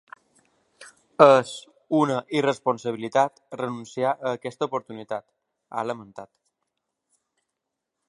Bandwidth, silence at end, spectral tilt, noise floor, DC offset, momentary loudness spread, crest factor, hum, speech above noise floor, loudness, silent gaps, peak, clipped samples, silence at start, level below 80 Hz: 11.5 kHz; 1.85 s; -5.5 dB/octave; -83 dBFS; under 0.1%; 20 LU; 26 dB; none; 60 dB; -24 LUFS; none; 0 dBFS; under 0.1%; 0.8 s; -76 dBFS